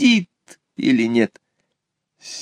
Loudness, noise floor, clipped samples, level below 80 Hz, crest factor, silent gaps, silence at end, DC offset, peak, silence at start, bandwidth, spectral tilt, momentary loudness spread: -19 LUFS; -77 dBFS; under 0.1%; -68 dBFS; 16 dB; none; 0 s; under 0.1%; -4 dBFS; 0 s; 10 kHz; -4.5 dB/octave; 20 LU